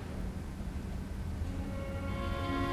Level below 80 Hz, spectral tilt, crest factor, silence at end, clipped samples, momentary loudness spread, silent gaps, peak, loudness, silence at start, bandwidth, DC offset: -42 dBFS; -7 dB/octave; 16 dB; 0 s; under 0.1%; 6 LU; none; -22 dBFS; -39 LUFS; 0 s; 14 kHz; under 0.1%